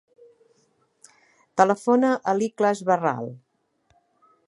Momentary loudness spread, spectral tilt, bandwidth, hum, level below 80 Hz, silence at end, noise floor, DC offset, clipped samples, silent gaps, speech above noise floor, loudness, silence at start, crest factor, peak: 11 LU; -6 dB/octave; 11.5 kHz; none; -76 dBFS; 1.15 s; -67 dBFS; under 0.1%; under 0.1%; none; 46 dB; -22 LUFS; 1.55 s; 24 dB; -2 dBFS